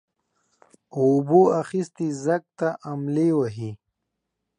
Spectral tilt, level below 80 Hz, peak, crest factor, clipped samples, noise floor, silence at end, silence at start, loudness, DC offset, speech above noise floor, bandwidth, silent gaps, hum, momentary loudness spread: -8 dB/octave; -68 dBFS; -6 dBFS; 18 dB; under 0.1%; -80 dBFS; 0.85 s; 0.95 s; -23 LUFS; under 0.1%; 58 dB; 10.5 kHz; none; none; 13 LU